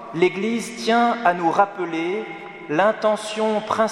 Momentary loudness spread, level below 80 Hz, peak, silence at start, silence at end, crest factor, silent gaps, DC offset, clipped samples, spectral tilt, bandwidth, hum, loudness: 7 LU; -66 dBFS; -4 dBFS; 0 s; 0 s; 18 dB; none; under 0.1%; under 0.1%; -4.5 dB/octave; 13.5 kHz; none; -21 LUFS